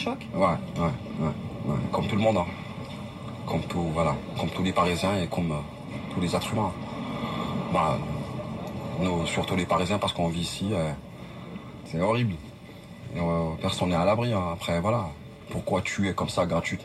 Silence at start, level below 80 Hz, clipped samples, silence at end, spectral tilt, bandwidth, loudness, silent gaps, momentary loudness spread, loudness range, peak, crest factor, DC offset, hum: 0 s; -48 dBFS; under 0.1%; 0 s; -6 dB/octave; 13.5 kHz; -28 LUFS; none; 13 LU; 2 LU; -10 dBFS; 18 dB; under 0.1%; none